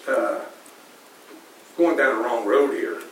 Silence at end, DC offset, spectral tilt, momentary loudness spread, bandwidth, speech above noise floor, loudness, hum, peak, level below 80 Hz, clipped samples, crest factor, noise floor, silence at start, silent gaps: 0 s; under 0.1%; -3.5 dB/octave; 14 LU; 16.5 kHz; 27 dB; -22 LUFS; none; -8 dBFS; -90 dBFS; under 0.1%; 16 dB; -48 dBFS; 0 s; none